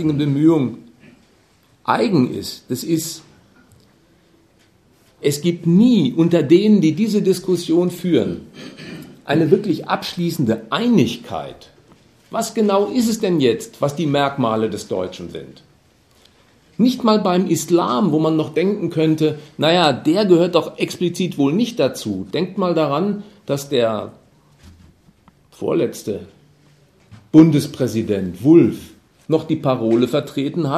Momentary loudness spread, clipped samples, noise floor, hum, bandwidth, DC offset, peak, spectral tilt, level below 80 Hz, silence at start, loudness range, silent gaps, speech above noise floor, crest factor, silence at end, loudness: 14 LU; under 0.1%; -55 dBFS; none; 14 kHz; under 0.1%; 0 dBFS; -6 dB/octave; -58 dBFS; 0 s; 7 LU; none; 38 dB; 18 dB; 0 s; -18 LUFS